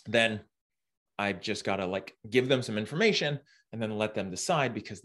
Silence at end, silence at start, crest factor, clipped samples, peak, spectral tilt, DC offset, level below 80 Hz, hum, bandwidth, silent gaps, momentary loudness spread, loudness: 0.05 s; 0.05 s; 20 dB; under 0.1%; -10 dBFS; -4.5 dB/octave; under 0.1%; -70 dBFS; none; 12.5 kHz; 0.61-0.70 s, 0.97-1.06 s; 11 LU; -30 LUFS